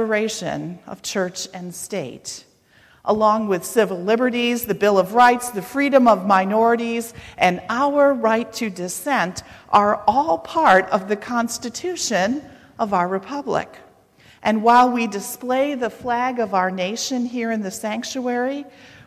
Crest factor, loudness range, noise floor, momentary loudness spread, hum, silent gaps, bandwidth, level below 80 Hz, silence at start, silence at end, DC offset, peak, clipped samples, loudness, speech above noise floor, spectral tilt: 18 dB; 6 LU; -54 dBFS; 13 LU; none; none; 15.5 kHz; -58 dBFS; 0 s; 0.35 s; under 0.1%; -4 dBFS; under 0.1%; -20 LUFS; 34 dB; -4 dB/octave